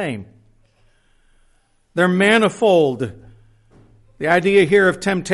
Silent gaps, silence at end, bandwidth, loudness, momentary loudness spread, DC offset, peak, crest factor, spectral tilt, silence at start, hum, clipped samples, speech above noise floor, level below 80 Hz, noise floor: none; 0 s; 11.5 kHz; -16 LUFS; 14 LU; under 0.1%; -2 dBFS; 16 dB; -5.5 dB/octave; 0 s; none; under 0.1%; 43 dB; -54 dBFS; -59 dBFS